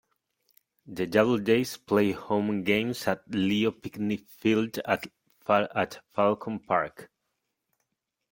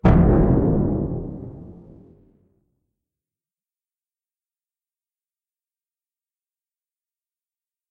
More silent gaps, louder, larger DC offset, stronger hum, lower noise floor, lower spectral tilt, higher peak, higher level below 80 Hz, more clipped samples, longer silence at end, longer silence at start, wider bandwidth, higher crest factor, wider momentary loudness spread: neither; second, -27 LUFS vs -19 LUFS; neither; neither; second, -82 dBFS vs under -90 dBFS; second, -6 dB/octave vs -11.5 dB/octave; about the same, -6 dBFS vs -4 dBFS; second, -66 dBFS vs -32 dBFS; neither; second, 1.25 s vs 6.2 s; first, 0.85 s vs 0.05 s; first, 17 kHz vs 4.6 kHz; about the same, 22 dB vs 20 dB; second, 8 LU vs 22 LU